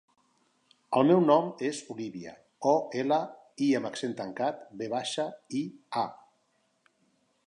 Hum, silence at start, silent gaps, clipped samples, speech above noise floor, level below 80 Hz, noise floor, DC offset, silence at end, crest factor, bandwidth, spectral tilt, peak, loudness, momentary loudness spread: none; 0.9 s; none; under 0.1%; 44 dB; -80 dBFS; -73 dBFS; under 0.1%; 1.3 s; 20 dB; 11 kHz; -5.5 dB/octave; -10 dBFS; -29 LUFS; 15 LU